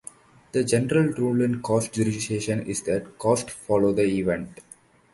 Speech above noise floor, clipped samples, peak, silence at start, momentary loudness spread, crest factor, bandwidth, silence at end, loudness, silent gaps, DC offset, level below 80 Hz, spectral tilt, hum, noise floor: 24 dB; under 0.1%; -6 dBFS; 0.55 s; 6 LU; 18 dB; 11.5 kHz; 0.6 s; -24 LUFS; none; under 0.1%; -54 dBFS; -5.5 dB/octave; none; -47 dBFS